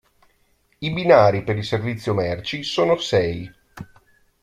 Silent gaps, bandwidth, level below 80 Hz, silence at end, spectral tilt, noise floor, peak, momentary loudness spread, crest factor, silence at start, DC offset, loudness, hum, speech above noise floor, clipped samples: none; 13 kHz; -52 dBFS; 0.6 s; -6 dB/octave; -63 dBFS; 0 dBFS; 23 LU; 20 dB; 0.8 s; under 0.1%; -20 LUFS; none; 43 dB; under 0.1%